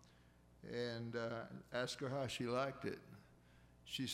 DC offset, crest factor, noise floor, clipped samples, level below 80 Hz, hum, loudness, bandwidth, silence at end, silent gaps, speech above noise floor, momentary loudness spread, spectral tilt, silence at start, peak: under 0.1%; 18 dB; -68 dBFS; under 0.1%; -72 dBFS; 60 Hz at -65 dBFS; -44 LUFS; 16 kHz; 0 s; none; 24 dB; 18 LU; -4.5 dB/octave; 0 s; -28 dBFS